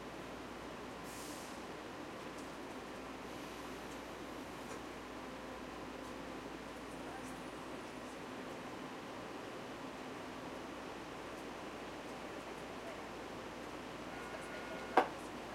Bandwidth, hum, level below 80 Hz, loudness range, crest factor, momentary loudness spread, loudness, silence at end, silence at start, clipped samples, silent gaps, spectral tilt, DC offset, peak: 16 kHz; none; -66 dBFS; 1 LU; 30 dB; 2 LU; -46 LUFS; 0 s; 0 s; under 0.1%; none; -4 dB/octave; under 0.1%; -16 dBFS